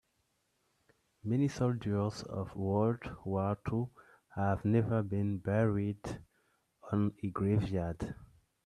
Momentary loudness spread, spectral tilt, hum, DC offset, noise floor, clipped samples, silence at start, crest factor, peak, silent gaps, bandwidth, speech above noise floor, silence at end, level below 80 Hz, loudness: 12 LU; -8.5 dB/octave; none; under 0.1%; -78 dBFS; under 0.1%; 1.25 s; 18 dB; -16 dBFS; none; 10.5 kHz; 45 dB; 0.4 s; -58 dBFS; -34 LUFS